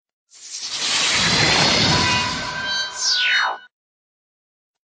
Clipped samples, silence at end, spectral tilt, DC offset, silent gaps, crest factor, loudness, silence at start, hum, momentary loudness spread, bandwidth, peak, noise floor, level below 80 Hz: under 0.1%; 1.2 s; -2 dB/octave; under 0.1%; none; 16 dB; -17 LUFS; 0.4 s; none; 12 LU; 10.5 kHz; -4 dBFS; under -90 dBFS; -46 dBFS